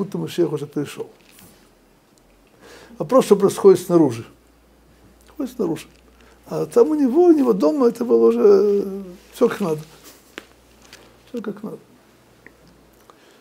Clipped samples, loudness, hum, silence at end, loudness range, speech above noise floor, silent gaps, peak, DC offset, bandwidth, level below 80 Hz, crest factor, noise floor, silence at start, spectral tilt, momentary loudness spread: under 0.1%; -18 LUFS; none; 1.65 s; 12 LU; 37 dB; none; 0 dBFS; under 0.1%; 16 kHz; -60 dBFS; 20 dB; -55 dBFS; 0 s; -7 dB/octave; 21 LU